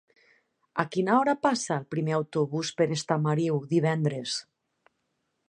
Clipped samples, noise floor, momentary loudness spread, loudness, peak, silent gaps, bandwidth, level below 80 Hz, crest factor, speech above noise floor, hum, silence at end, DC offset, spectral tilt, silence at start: under 0.1%; -78 dBFS; 8 LU; -27 LUFS; -6 dBFS; none; 11 kHz; -74 dBFS; 22 dB; 51 dB; none; 1.1 s; under 0.1%; -5.5 dB/octave; 0.75 s